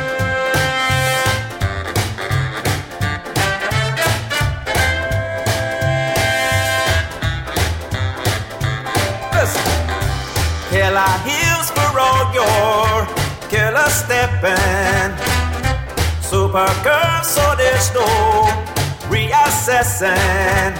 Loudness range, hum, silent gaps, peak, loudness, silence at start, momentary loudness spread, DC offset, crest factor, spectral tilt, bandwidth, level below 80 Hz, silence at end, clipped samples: 4 LU; none; none; -4 dBFS; -16 LUFS; 0 s; 7 LU; under 0.1%; 14 dB; -3.5 dB/octave; 17 kHz; -30 dBFS; 0 s; under 0.1%